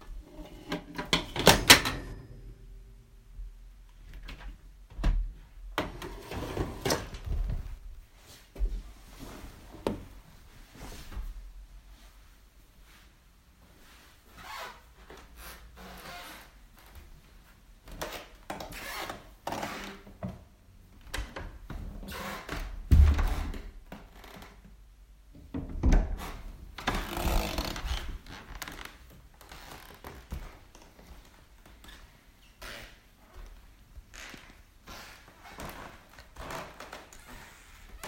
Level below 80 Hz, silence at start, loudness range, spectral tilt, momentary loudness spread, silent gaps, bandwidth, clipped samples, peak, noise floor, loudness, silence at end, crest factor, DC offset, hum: -38 dBFS; 0 s; 20 LU; -3.5 dB/octave; 23 LU; none; 16 kHz; under 0.1%; 0 dBFS; -59 dBFS; -31 LUFS; 0 s; 34 dB; under 0.1%; none